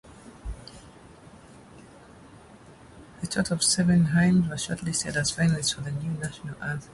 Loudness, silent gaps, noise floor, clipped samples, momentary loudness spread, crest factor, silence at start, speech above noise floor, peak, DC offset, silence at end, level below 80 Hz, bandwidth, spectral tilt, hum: -25 LUFS; none; -50 dBFS; under 0.1%; 20 LU; 18 dB; 0.05 s; 25 dB; -10 dBFS; under 0.1%; 0 s; -50 dBFS; 11.5 kHz; -4.5 dB/octave; none